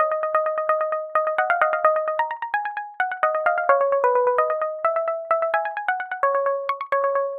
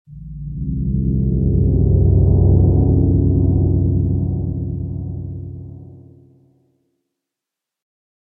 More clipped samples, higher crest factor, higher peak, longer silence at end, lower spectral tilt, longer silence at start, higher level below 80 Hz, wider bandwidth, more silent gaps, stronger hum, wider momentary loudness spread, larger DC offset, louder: neither; about the same, 20 dB vs 16 dB; about the same, -2 dBFS vs -2 dBFS; second, 0 s vs 2.25 s; second, -3.5 dB/octave vs -17 dB/octave; about the same, 0 s vs 0.1 s; second, -72 dBFS vs -24 dBFS; first, 4.7 kHz vs 1.1 kHz; neither; neither; second, 7 LU vs 17 LU; neither; second, -22 LUFS vs -17 LUFS